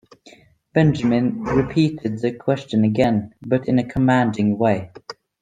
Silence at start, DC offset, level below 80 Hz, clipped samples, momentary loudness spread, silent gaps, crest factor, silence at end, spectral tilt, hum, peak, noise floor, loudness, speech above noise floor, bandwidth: 0.75 s; under 0.1%; -46 dBFS; under 0.1%; 7 LU; none; 18 dB; 0.3 s; -8 dB/octave; none; -2 dBFS; -50 dBFS; -20 LUFS; 31 dB; 9.2 kHz